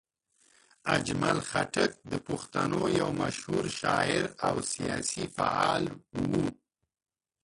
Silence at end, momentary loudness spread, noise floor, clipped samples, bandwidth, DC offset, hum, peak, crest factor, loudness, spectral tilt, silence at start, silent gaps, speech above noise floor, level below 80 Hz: 0.9 s; 7 LU; under -90 dBFS; under 0.1%; 11.5 kHz; under 0.1%; none; -10 dBFS; 20 dB; -30 LUFS; -4.5 dB/octave; 0.85 s; none; over 60 dB; -58 dBFS